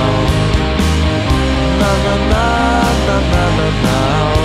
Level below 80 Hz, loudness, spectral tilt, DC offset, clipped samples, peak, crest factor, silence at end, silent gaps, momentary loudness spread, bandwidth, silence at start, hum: -18 dBFS; -13 LUFS; -5.5 dB/octave; under 0.1%; under 0.1%; -2 dBFS; 12 dB; 0 s; none; 2 LU; 14.5 kHz; 0 s; none